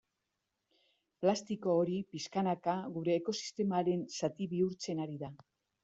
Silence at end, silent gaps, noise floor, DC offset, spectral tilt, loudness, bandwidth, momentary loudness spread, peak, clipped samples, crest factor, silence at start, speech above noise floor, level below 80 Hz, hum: 0.45 s; none; -86 dBFS; under 0.1%; -6 dB/octave; -35 LUFS; 8 kHz; 7 LU; -16 dBFS; under 0.1%; 20 dB; 1.2 s; 51 dB; -78 dBFS; none